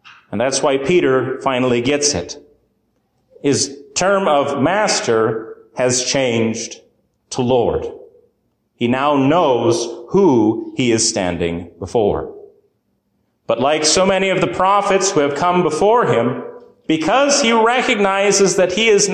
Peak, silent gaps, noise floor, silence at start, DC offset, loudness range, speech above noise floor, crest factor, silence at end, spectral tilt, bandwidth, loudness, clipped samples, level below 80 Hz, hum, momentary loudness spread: -2 dBFS; none; -66 dBFS; 0.05 s; under 0.1%; 4 LU; 50 dB; 14 dB; 0 s; -3.5 dB/octave; 10.5 kHz; -16 LUFS; under 0.1%; -46 dBFS; none; 10 LU